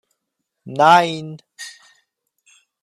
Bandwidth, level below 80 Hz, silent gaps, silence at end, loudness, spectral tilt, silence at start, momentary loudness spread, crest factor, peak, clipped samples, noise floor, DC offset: 13.5 kHz; -70 dBFS; none; 1.15 s; -14 LUFS; -4.5 dB/octave; 0.65 s; 23 LU; 20 dB; 0 dBFS; under 0.1%; -77 dBFS; under 0.1%